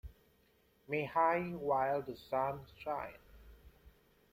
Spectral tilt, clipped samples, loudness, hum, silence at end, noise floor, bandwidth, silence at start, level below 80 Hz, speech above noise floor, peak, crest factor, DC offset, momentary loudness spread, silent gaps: -7.5 dB/octave; under 0.1%; -36 LUFS; none; 0.45 s; -71 dBFS; 16.5 kHz; 0.05 s; -62 dBFS; 35 dB; -18 dBFS; 20 dB; under 0.1%; 12 LU; none